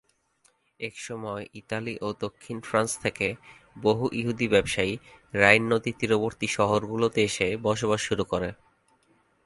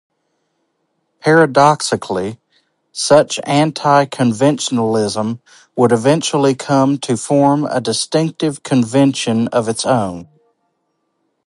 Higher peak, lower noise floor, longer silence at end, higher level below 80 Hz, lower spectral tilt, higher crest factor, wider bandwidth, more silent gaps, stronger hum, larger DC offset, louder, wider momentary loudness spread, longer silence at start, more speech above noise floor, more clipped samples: about the same, -2 dBFS vs 0 dBFS; about the same, -67 dBFS vs -68 dBFS; second, 0.9 s vs 1.25 s; about the same, -54 dBFS vs -56 dBFS; about the same, -4.5 dB/octave vs -5 dB/octave; first, 26 dB vs 16 dB; about the same, 11.5 kHz vs 11.5 kHz; neither; neither; neither; second, -26 LUFS vs -15 LUFS; first, 14 LU vs 9 LU; second, 0.8 s vs 1.25 s; second, 41 dB vs 54 dB; neither